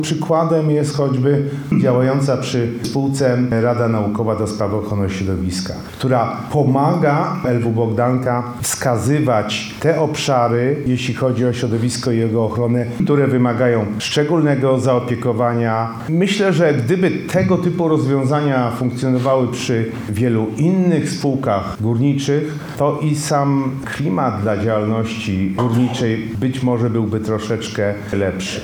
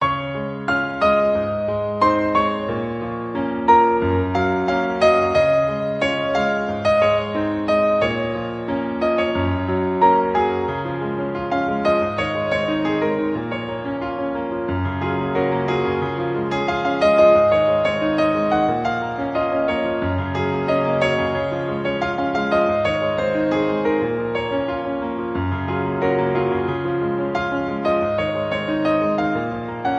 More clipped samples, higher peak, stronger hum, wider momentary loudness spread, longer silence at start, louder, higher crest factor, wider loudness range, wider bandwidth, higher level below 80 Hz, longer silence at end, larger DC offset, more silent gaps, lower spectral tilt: neither; about the same, -2 dBFS vs -2 dBFS; neither; second, 5 LU vs 8 LU; about the same, 0 s vs 0 s; first, -17 LUFS vs -20 LUFS; about the same, 14 dB vs 18 dB; about the same, 2 LU vs 4 LU; first, 19 kHz vs 8.8 kHz; second, -48 dBFS vs -42 dBFS; about the same, 0 s vs 0 s; neither; neither; about the same, -6.5 dB/octave vs -7 dB/octave